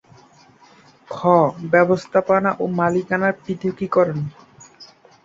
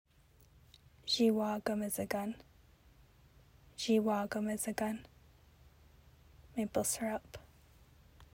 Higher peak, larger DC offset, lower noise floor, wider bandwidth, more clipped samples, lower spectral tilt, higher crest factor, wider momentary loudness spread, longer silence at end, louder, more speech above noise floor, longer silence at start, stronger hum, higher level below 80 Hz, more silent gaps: first, -2 dBFS vs -20 dBFS; neither; second, -50 dBFS vs -65 dBFS; second, 7.8 kHz vs 16 kHz; neither; first, -7.5 dB/octave vs -4 dB/octave; about the same, 18 dB vs 20 dB; second, 9 LU vs 16 LU; first, 0.4 s vs 0.1 s; first, -19 LUFS vs -36 LUFS; about the same, 32 dB vs 31 dB; about the same, 1.1 s vs 1.05 s; neither; first, -60 dBFS vs -66 dBFS; neither